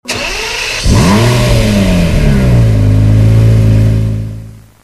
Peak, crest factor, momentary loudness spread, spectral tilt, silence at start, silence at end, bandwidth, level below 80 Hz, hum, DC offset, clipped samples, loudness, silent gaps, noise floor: 0 dBFS; 8 dB; 8 LU; -6 dB/octave; 0.05 s; 0.25 s; 13.5 kHz; -16 dBFS; none; under 0.1%; 0.2%; -9 LUFS; none; -28 dBFS